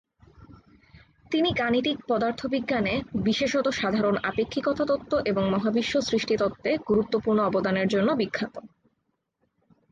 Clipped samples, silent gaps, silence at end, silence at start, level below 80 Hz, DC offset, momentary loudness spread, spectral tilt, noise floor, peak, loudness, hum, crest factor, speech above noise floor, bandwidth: under 0.1%; none; 1.25 s; 0.4 s; -54 dBFS; under 0.1%; 4 LU; -5.5 dB/octave; -76 dBFS; -12 dBFS; -25 LUFS; none; 14 dB; 51 dB; 9 kHz